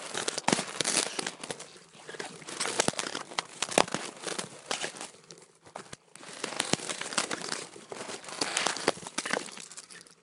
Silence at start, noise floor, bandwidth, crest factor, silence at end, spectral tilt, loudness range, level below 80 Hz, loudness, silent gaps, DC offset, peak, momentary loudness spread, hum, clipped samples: 0 s; -54 dBFS; 16 kHz; 34 dB; 0.1 s; -1.5 dB/octave; 4 LU; -72 dBFS; -32 LUFS; none; under 0.1%; 0 dBFS; 18 LU; none; under 0.1%